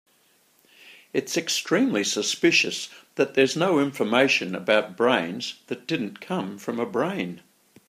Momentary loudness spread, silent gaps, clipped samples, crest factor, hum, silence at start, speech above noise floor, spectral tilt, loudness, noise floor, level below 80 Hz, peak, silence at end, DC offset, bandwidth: 12 LU; none; under 0.1%; 22 dB; none; 0.85 s; 38 dB; -3.5 dB/octave; -24 LUFS; -63 dBFS; -74 dBFS; -4 dBFS; 0.5 s; under 0.1%; 15.5 kHz